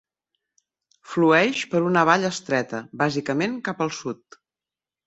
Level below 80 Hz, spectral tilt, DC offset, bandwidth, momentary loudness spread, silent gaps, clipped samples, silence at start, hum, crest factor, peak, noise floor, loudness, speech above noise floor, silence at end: -66 dBFS; -5 dB/octave; under 0.1%; 8.2 kHz; 14 LU; none; under 0.1%; 1.1 s; none; 22 dB; -2 dBFS; under -90 dBFS; -22 LUFS; over 68 dB; 0.95 s